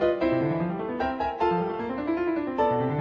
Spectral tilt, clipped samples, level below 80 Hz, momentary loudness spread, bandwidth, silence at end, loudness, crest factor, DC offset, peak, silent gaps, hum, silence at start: -9 dB/octave; under 0.1%; -52 dBFS; 5 LU; 6.2 kHz; 0 s; -27 LUFS; 16 dB; under 0.1%; -10 dBFS; none; none; 0 s